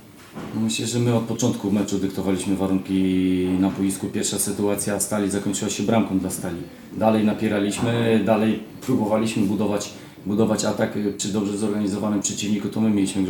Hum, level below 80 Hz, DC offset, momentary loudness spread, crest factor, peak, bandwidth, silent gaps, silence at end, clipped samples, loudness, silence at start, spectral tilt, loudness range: none; -56 dBFS; under 0.1%; 6 LU; 18 dB; -4 dBFS; 18.5 kHz; none; 0 s; under 0.1%; -22 LUFS; 0 s; -5 dB/octave; 2 LU